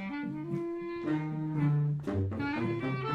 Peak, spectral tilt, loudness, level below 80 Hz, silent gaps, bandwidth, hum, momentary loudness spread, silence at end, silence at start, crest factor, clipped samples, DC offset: -18 dBFS; -9 dB/octave; -33 LUFS; -62 dBFS; none; 5.8 kHz; none; 7 LU; 0 s; 0 s; 14 dB; under 0.1%; under 0.1%